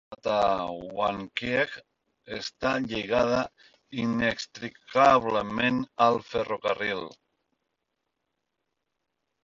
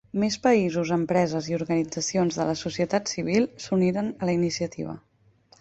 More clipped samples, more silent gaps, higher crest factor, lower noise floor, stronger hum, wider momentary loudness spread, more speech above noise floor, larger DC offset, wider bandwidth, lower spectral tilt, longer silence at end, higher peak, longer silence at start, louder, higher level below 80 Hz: neither; neither; about the same, 22 dB vs 18 dB; first, -82 dBFS vs -60 dBFS; neither; first, 14 LU vs 7 LU; first, 56 dB vs 35 dB; neither; about the same, 7.8 kHz vs 8.2 kHz; about the same, -5 dB/octave vs -5.5 dB/octave; first, 2.35 s vs 0.65 s; about the same, -8 dBFS vs -8 dBFS; about the same, 0.1 s vs 0.15 s; about the same, -27 LUFS vs -25 LUFS; about the same, -58 dBFS vs -60 dBFS